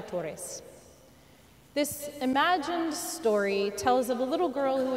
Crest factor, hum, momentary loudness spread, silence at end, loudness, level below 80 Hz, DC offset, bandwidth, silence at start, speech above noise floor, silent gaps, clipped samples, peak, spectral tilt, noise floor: 18 dB; none; 10 LU; 0 s; -29 LUFS; -64 dBFS; under 0.1%; 16 kHz; 0 s; 28 dB; none; under 0.1%; -12 dBFS; -3.5 dB/octave; -57 dBFS